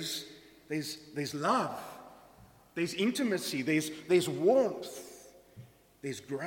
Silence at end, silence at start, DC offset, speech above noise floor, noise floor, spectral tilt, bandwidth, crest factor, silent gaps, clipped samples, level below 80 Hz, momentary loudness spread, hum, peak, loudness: 0 s; 0 s; under 0.1%; 27 dB; -59 dBFS; -4.5 dB/octave; 17.5 kHz; 18 dB; none; under 0.1%; -72 dBFS; 19 LU; none; -14 dBFS; -32 LUFS